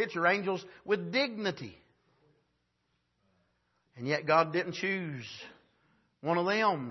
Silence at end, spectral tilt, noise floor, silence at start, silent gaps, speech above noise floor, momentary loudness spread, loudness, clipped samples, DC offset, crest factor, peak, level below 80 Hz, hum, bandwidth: 0 s; -5.5 dB/octave; -78 dBFS; 0 s; none; 47 dB; 17 LU; -31 LUFS; under 0.1%; under 0.1%; 22 dB; -12 dBFS; -78 dBFS; none; 6.2 kHz